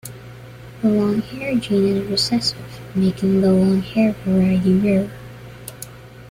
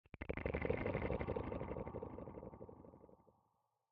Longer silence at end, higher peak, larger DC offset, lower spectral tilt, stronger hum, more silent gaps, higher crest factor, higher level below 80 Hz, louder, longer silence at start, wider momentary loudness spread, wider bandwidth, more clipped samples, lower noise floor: second, 0 s vs 0.75 s; first, -6 dBFS vs -24 dBFS; neither; about the same, -6.5 dB/octave vs -7 dB/octave; neither; neither; second, 14 dB vs 22 dB; first, -48 dBFS vs -56 dBFS; first, -18 LUFS vs -44 LUFS; about the same, 0.05 s vs 0.15 s; first, 20 LU vs 17 LU; first, 15.5 kHz vs 5.2 kHz; neither; second, -38 dBFS vs -83 dBFS